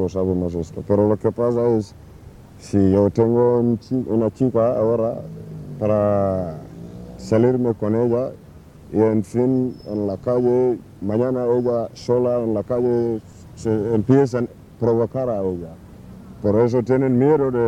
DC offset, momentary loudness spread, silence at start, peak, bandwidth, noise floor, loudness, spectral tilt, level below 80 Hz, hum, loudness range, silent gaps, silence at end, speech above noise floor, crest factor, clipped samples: under 0.1%; 13 LU; 0 s; -2 dBFS; 11 kHz; -43 dBFS; -20 LUFS; -9 dB/octave; -48 dBFS; none; 2 LU; none; 0 s; 24 dB; 16 dB; under 0.1%